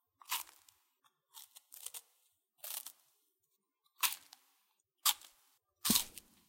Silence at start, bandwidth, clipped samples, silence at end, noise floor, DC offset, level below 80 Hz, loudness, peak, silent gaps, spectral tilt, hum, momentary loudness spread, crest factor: 0.3 s; 17 kHz; under 0.1%; 0.3 s; -84 dBFS; under 0.1%; -74 dBFS; -37 LUFS; -10 dBFS; none; -0.5 dB/octave; none; 23 LU; 32 dB